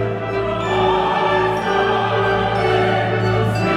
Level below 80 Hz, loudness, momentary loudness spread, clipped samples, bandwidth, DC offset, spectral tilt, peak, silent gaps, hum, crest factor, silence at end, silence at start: -40 dBFS; -18 LUFS; 4 LU; under 0.1%; 12 kHz; under 0.1%; -6.5 dB/octave; -4 dBFS; none; none; 12 dB; 0 s; 0 s